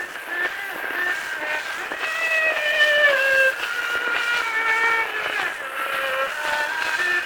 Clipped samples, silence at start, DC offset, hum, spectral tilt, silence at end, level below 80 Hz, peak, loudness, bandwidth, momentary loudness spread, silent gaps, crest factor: under 0.1%; 0 s; under 0.1%; none; -0.5 dB/octave; 0 s; -64 dBFS; -6 dBFS; -21 LUFS; over 20 kHz; 10 LU; none; 18 dB